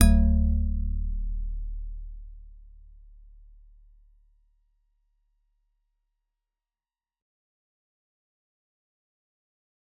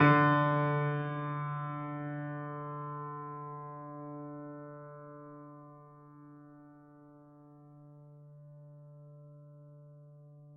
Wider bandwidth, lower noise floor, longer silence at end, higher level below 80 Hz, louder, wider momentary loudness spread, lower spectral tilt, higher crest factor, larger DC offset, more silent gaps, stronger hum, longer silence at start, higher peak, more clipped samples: second, 4 kHz vs 5.4 kHz; first, under -90 dBFS vs -57 dBFS; first, 7.4 s vs 0 s; first, -32 dBFS vs -80 dBFS; first, -28 LUFS vs -34 LUFS; second, 23 LU vs 26 LU; first, -8 dB/octave vs -6 dB/octave; about the same, 28 dB vs 26 dB; neither; neither; neither; about the same, 0 s vs 0 s; first, -2 dBFS vs -10 dBFS; neither